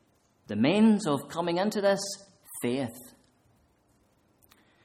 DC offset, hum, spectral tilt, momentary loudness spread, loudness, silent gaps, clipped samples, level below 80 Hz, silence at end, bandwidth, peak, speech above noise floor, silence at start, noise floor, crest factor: under 0.1%; none; -5 dB/octave; 16 LU; -27 LUFS; none; under 0.1%; -72 dBFS; 1.75 s; 16 kHz; -12 dBFS; 41 dB; 0.5 s; -67 dBFS; 18 dB